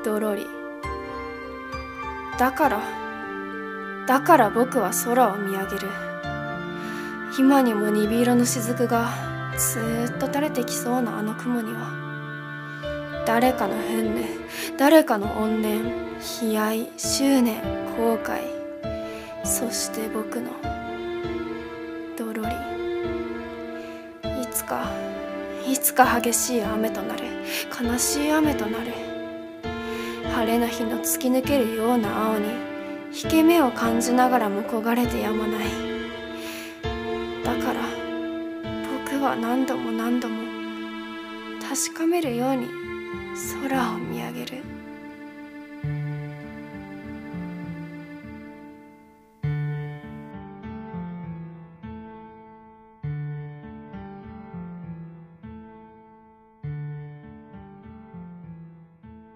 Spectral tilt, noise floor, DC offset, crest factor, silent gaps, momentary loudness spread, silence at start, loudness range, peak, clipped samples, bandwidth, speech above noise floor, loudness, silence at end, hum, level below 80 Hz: -4.5 dB/octave; -53 dBFS; under 0.1%; 24 dB; none; 19 LU; 0 s; 16 LU; -2 dBFS; under 0.1%; 16 kHz; 30 dB; -25 LUFS; 0.05 s; none; -48 dBFS